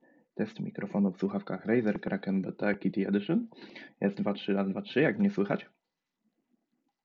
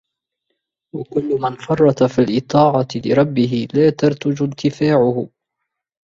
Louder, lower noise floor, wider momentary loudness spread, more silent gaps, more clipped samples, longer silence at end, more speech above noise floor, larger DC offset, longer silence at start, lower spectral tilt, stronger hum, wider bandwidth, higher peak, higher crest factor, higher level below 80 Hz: second, -31 LUFS vs -17 LUFS; first, -84 dBFS vs -78 dBFS; about the same, 9 LU vs 9 LU; neither; neither; first, 1.4 s vs 0.75 s; second, 53 dB vs 62 dB; neither; second, 0.35 s vs 0.95 s; about the same, -6.5 dB/octave vs -7.5 dB/octave; neither; second, 6 kHz vs 7.6 kHz; second, -14 dBFS vs -2 dBFS; about the same, 18 dB vs 16 dB; second, -74 dBFS vs -54 dBFS